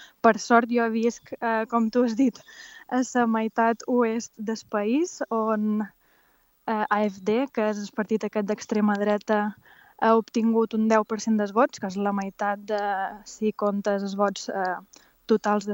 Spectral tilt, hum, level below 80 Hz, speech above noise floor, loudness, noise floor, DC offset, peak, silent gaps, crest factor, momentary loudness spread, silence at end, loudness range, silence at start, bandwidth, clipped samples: -5.5 dB/octave; none; -70 dBFS; 39 dB; -25 LUFS; -64 dBFS; under 0.1%; -4 dBFS; none; 22 dB; 8 LU; 0 s; 3 LU; 0 s; 16.5 kHz; under 0.1%